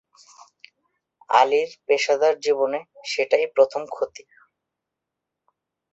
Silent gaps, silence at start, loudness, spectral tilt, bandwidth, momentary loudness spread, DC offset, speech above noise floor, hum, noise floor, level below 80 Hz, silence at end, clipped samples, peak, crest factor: none; 1.3 s; -22 LUFS; -1.5 dB/octave; 8 kHz; 11 LU; under 0.1%; 63 dB; none; -84 dBFS; -74 dBFS; 1.75 s; under 0.1%; -2 dBFS; 22 dB